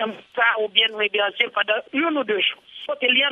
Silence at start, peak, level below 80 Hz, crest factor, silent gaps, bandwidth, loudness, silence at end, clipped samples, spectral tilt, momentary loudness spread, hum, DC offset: 0 s; -2 dBFS; -76 dBFS; 20 dB; none; 6 kHz; -20 LUFS; 0 s; under 0.1%; -4.5 dB/octave; 6 LU; none; under 0.1%